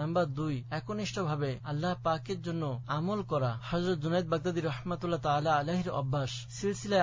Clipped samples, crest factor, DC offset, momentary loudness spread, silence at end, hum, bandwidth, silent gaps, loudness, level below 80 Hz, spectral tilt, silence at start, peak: under 0.1%; 18 dB; under 0.1%; 6 LU; 0 s; none; 7.6 kHz; none; -33 LUFS; -56 dBFS; -6.5 dB/octave; 0 s; -14 dBFS